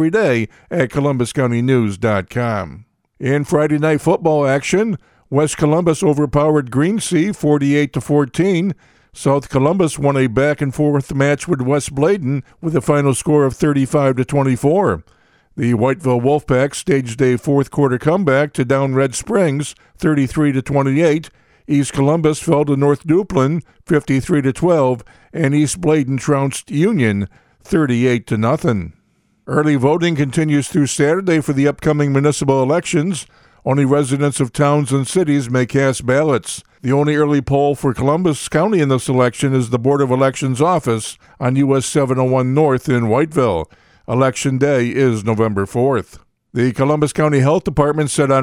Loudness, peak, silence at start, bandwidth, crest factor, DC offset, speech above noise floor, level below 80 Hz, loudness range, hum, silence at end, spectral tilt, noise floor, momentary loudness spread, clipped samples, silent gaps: -16 LUFS; 0 dBFS; 0 s; 14 kHz; 16 dB; under 0.1%; 44 dB; -44 dBFS; 1 LU; none; 0 s; -6.5 dB/octave; -60 dBFS; 6 LU; under 0.1%; none